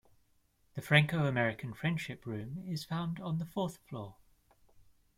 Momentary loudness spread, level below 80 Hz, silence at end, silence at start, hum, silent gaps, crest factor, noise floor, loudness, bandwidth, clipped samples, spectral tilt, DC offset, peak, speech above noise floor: 18 LU; -66 dBFS; 1.05 s; 0.75 s; none; none; 24 dB; -71 dBFS; -34 LUFS; 15.5 kHz; under 0.1%; -6 dB/octave; under 0.1%; -10 dBFS; 37 dB